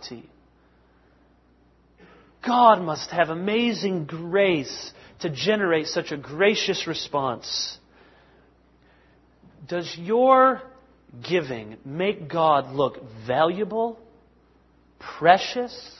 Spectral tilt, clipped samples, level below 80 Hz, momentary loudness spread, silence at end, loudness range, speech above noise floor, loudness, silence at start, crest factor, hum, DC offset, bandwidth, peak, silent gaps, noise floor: -4.5 dB/octave; under 0.1%; -62 dBFS; 16 LU; 0.1 s; 4 LU; 36 dB; -23 LUFS; 0 s; 24 dB; none; under 0.1%; 6.2 kHz; 0 dBFS; none; -59 dBFS